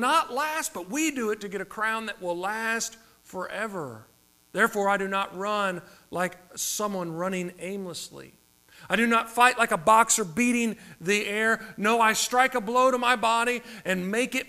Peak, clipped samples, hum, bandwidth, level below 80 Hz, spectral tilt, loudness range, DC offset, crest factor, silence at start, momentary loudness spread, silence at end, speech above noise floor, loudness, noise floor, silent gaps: -4 dBFS; under 0.1%; none; 15.5 kHz; -64 dBFS; -3 dB/octave; 8 LU; under 0.1%; 24 dB; 0 s; 14 LU; 0 s; 27 dB; -25 LUFS; -53 dBFS; none